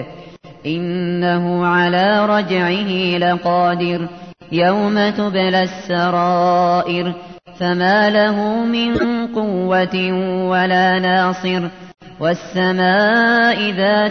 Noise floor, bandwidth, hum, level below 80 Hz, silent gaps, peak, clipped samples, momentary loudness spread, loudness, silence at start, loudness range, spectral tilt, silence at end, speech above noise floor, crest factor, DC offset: -38 dBFS; 6.6 kHz; none; -52 dBFS; none; -4 dBFS; under 0.1%; 8 LU; -16 LUFS; 0 s; 1 LU; -6.5 dB/octave; 0 s; 22 dB; 12 dB; 0.2%